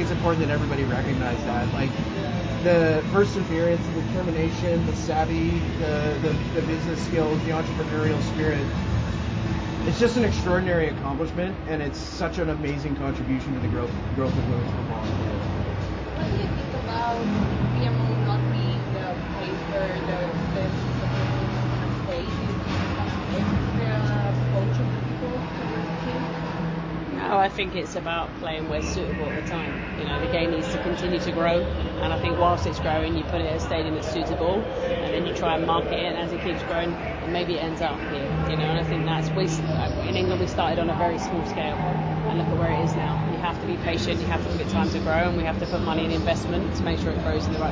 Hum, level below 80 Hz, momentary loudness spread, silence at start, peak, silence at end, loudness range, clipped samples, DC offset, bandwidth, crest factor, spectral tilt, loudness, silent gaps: none; -36 dBFS; 6 LU; 0 s; -8 dBFS; 0 s; 3 LU; under 0.1%; under 0.1%; 7.8 kHz; 18 dB; -6.5 dB/octave; -25 LUFS; none